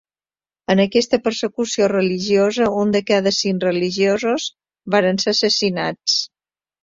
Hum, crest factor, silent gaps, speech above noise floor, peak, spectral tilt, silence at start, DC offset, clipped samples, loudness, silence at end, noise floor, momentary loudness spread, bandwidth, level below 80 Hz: none; 16 dB; none; over 72 dB; -2 dBFS; -4 dB/octave; 0.7 s; under 0.1%; under 0.1%; -18 LUFS; 0.6 s; under -90 dBFS; 6 LU; 7.8 kHz; -58 dBFS